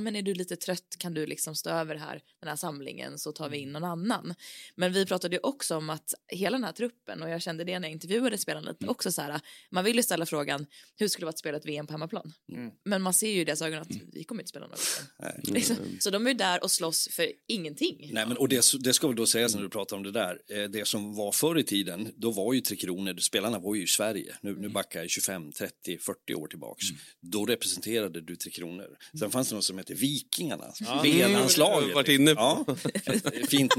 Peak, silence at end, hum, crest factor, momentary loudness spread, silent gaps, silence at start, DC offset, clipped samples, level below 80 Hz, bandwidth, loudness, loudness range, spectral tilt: -6 dBFS; 0 s; none; 24 dB; 15 LU; none; 0 s; under 0.1%; under 0.1%; -74 dBFS; 16.5 kHz; -29 LUFS; 8 LU; -3 dB/octave